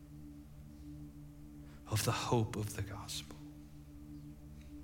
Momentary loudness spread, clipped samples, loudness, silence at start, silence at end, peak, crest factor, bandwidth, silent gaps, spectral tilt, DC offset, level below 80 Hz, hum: 19 LU; under 0.1%; -39 LUFS; 0 s; 0 s; -20 dBFS; 22 dB; 16.5 kHz; none; -5 dB/octave; under 0.1%; -58 dBFS; none